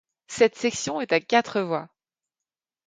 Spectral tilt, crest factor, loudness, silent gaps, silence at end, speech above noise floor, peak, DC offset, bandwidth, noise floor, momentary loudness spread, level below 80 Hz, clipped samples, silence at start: -3.5 dB/octave; 20 dB; -24 LUFS; none; 1 s; over 66 dB; -6 dBFS; under 0.1%; 9.4 kHz; under -90 dBFS; 9 LU; -68 dBFS; under 0.1%; 0.3 s